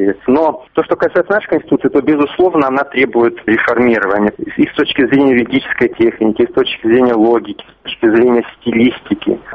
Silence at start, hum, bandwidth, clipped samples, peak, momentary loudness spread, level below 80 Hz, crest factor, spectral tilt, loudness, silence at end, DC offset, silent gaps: 0 s; none; 5.2 kHz; under 0.1%; 0 dBFS; 6 LU; -48 dBFS; 12 dB; -8 dB/octave; -13 LUFS; 0 s; under 0.1%; none